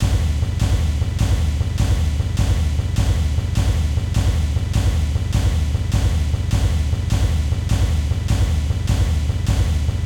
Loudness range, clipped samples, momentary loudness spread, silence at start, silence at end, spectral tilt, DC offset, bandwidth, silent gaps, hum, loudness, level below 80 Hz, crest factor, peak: 0 LU; under 0.1%; 2 LU; 0 s; 0 s; -6 dB/octave; 0.1%; 16 kHz; none; none; -20 LUFS; -20 dBFS; 12 dB; -6 dBFS